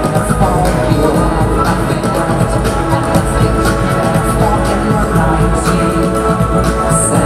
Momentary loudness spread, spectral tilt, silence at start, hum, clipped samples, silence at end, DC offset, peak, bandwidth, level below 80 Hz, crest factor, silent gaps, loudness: 2 LU; -6 dB/octave; 0 s; none; under 0.1%; 0 s; under 0.1%; 0 dBFS; 15 kHz; -20 dBFS; 12 dB; none; -13 LUFS